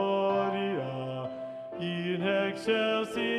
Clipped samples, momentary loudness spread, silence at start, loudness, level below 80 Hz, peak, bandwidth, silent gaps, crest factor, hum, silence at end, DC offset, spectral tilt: under 0.1%; 10 LU; 0 s; -31 LUFS; -72 dBFS; -16 dBFS; 12.5 kHz; none; 14 dB; none; 0 s; under 0.1%; -6 dB/octave